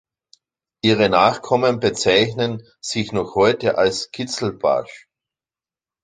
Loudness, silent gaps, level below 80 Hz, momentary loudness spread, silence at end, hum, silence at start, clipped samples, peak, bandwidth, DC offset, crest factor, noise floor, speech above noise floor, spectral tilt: -19 LUFS; none; -54 dBFS; 10 LU; 1.05 s; none; 0.85 s; under 0.1%; -2 dBFS; 9.6 kHz; under 0.1%; 18 dB; under -90 dBFS; over 71 dB; -4.5 dB/octave